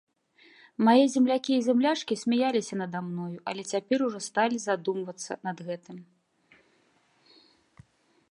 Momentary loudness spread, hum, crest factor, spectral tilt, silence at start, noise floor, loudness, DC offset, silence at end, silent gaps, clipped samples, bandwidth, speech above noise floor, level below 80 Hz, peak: 15 LU; none; 20 dB; -5 dB/octave; 0.8 s; -67 dBFS; -27 LUFS; under 0.1%; 2.25 s; none; under 0.1%; 11 kHz; 40 dB; -78 dBFS; -8 dBFS